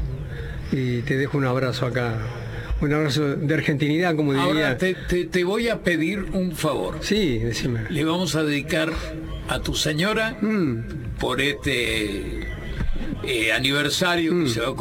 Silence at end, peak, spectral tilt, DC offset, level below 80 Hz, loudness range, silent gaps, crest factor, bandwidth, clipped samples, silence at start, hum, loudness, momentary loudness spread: 0 s; -4 dBFS; -5 dB/octave; under 0.1%; -36 dBFS; 2 LU; none; 18 dB; 17 kHz; under 0.1%; 0 s; none; -23 LUFS; 10 LU